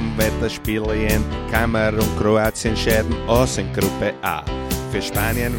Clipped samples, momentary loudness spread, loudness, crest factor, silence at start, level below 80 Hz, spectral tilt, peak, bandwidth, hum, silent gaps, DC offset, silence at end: under 0.1%; 6 LU; -20 LUFS; 18 dB; 0 s; -28 dBFS; -5 dB/octave; -2 dBFS; 17 kHz; none; none; under 0.1%; 0 s